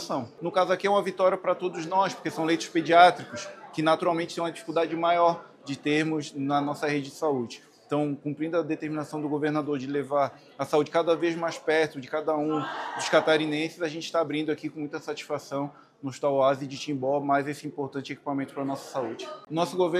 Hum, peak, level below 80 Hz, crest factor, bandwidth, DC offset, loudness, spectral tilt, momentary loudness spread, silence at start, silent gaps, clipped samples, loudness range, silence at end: none; -4 dBFS; -78 dBFS; 24 dB; 14.5 kHz; under 0.1%; -27 LUFS; -5 dB/octave; 11 LU; 0 s; none; under 0.1%; 5 LU; 0 s